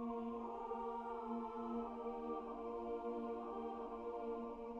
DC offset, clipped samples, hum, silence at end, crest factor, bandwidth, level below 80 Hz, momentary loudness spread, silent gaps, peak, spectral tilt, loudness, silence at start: under 0.1%; under 0.1%; none; 0 s; 12 dB; 7.2 kHz; -68 dBFS; 2 LU; none; -32 dBFS; -7.5 dB/octave; -46 LUFS; 0 s